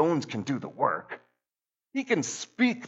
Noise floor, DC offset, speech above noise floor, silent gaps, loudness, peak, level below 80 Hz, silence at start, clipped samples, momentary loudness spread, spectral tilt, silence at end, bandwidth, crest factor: under -90 dBFS; under 0.1%; over 61 dB; none; -30 LUFS; -10 dBFS; -78 dBFS; 0 s; under 0.1%; 9 LU; -4.5 dB/octave; 0 s; 8.2 kHz; 20 dB